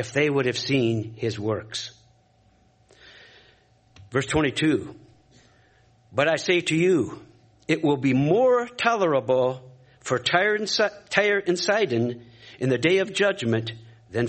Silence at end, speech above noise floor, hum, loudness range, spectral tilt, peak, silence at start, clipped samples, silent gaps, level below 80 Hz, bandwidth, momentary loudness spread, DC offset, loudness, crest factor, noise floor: 0 s; 38 dB; none; 7 LU; -5 dB/octave; -2 dBFS; 0 s; under 0.1%; none; -58 dBFS; 8.8 kHz; 12 LU; under 0.1%; -23 LUFS; 24 dB; -60 dBFS